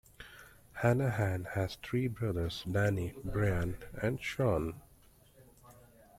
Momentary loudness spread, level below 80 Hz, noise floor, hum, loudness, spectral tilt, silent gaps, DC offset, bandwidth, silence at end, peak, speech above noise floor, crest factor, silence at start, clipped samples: 19 LU; -52 dBFS; -62 dBFS; none; -34 LUFS; -7 dB/octave; none; under 0.1%; 16 kHz; 0.45 s; -14 dBFS; 29 dB; 22 dB; 0.2 s; under 0.1%